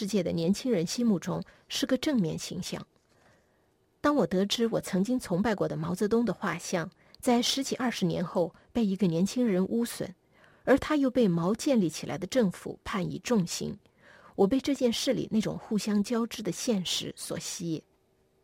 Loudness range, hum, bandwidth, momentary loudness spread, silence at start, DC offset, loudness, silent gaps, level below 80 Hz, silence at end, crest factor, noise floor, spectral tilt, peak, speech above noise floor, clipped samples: 3 LU; none; 16.5 kHz; 10 LU; 0 s; under 0.1%; -29 LUFS; none; -60 dBFS; 0.65 s; 18 dB; -69 dBFS; -5 dB/octave; -12 dBFS; 40 dB; under 0.1%